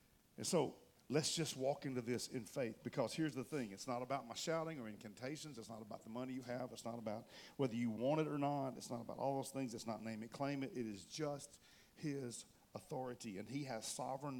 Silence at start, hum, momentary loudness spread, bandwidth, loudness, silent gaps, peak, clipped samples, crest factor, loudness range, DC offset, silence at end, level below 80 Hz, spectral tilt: 0.4 s; none; 12 LU; 17.5 kHz; -44 LUFS; none; -24 dBFS; under 0.1%; 20 dB; 5 LU; under 0.1%; 0 s; -80 dBFS; -4.5 dB/octave